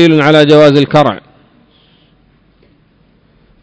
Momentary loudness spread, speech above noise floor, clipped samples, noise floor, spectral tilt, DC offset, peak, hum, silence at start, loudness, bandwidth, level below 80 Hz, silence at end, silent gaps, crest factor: 9 LU; 43 dB; 3%; -50 dBFS; -7 dB/octave; under 0.1%; 0 dBFS; none; 0 s; -7 LUFS; 8 kHz; -48 dBFS; 2.45 s; none; 12 dB